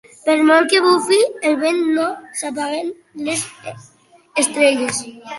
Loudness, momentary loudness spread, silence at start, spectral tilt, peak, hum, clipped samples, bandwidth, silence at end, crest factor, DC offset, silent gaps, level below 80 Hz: -17 LUFS; 14 LU; 0.25 s; -2.5 dB/octave; -2 dBFS; none; under 0.1%; 12 kHz; 0 s; 16 dB; under 0.1%; none; -68 dBFS